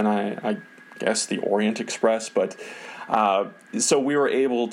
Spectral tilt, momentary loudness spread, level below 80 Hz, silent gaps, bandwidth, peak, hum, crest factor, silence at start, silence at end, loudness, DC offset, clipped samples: -3.5 dB/octave; 10 LU; -76 dBFS; none; 14 kHz; -6 dBFS; none; 18 dB; 0 s; 0 s; -24 LUFS; under 0.1%; under 0.1%